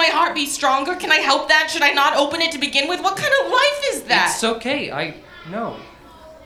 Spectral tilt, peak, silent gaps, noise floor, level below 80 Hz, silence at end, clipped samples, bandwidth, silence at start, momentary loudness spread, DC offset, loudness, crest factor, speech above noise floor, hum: -1.5 dB/octave; 0 dBFS; none; -42 dBFS; -54 dBFS; 0 s; under 0.1%; 16.5 kHz; 0 s; 13 LU; under 0.1%; -17 LUFS; 20 dB; 24 dB; none